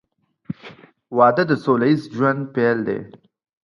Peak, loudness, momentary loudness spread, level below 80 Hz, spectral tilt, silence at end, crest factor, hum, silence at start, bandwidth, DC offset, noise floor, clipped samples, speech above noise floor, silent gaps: -2 dBFS; -19 LUFS; 19 LU; -64 dBFS; -8.5 dB/octave; 0.55 s; 20 dB; none; 0.5 s; 11 kHz; under 0.1%; -44 dBFS; under 0.1%; 26 dB; none